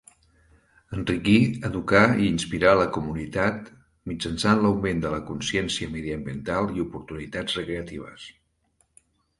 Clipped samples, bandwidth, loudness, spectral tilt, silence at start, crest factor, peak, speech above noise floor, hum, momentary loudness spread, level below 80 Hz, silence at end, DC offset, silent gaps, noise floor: under 0.1%; 11.5 kHz; -24 LUFS; -5.5 dB/octave; 0.9 s; 22 dB; -2 dBFS; 44 dB; none; 17 LU; -46 dBFS; 1.1 s; under 0.1%; none; -69 dBFS